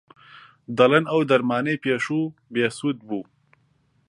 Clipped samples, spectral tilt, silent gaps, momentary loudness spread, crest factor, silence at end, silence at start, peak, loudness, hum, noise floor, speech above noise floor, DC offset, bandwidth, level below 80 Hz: under 0.1%; -6 dB/octave; none; 13 LU; 22 dB; 0.85 s; 0.35 s; -2 dBFS; -22 LUFS; none; -64 dBFS; 43 dB; under 0.1%; 11.5 kHz; -68 dBFS